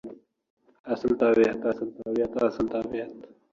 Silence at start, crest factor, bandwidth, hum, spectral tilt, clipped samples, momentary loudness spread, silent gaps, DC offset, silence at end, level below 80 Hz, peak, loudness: 0.05 s; 18 dB; 7.4 kHz; none; -7 dB/octave; under 0.1%; 16 LU; 0.50-0.57 s, 0.79-0.84 s; under 0.1%; 0.25 s; -58 dBFS; -8 dBFS; -26 LUFS